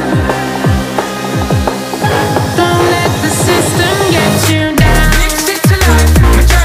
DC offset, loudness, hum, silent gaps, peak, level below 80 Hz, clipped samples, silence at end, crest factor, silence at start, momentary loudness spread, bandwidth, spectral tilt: under 0.1%; -10 LUFS; none; none; 0 dBFS; -16 dBFS; under 0.1%; 0 s; 10 dB; 0 s; 6 LU; 16.5 kHz; -4.5 dB/octave